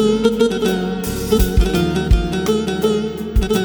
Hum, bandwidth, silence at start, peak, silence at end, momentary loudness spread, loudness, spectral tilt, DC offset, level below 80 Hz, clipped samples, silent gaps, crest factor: none; over 20 kHz; 0 s; -2 dBFS; 0 s; 5 LU; -18 LUFS; -6 dB/octave; under 0.1%; -22 dBFS; under 0.1%; none; 14 dB